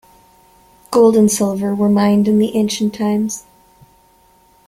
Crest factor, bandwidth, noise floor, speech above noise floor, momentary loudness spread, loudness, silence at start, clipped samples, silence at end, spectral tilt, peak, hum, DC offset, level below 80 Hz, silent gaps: 16 dB; 15 kHz; -52 dBFS; 38 dB; 8 LU; -15 LUFS; 0.9 s; under 0.1%; 1.3 s; -5.5 dB/octave; -2 dBFS; none; under 0.1%; -54 dBFS; none